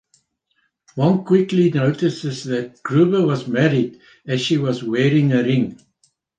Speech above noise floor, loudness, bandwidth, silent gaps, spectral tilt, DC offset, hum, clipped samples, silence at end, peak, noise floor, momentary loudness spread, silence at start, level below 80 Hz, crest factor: 50 dB; -19 LUFS; 9.2 kHz; none; -7 dB/octave; under 0.1%; none; under 0.1%; 0.65 s; -2 dBFS; -68 dBFS; 10 LU; 0.95 s; -62 dBFS; 16 dB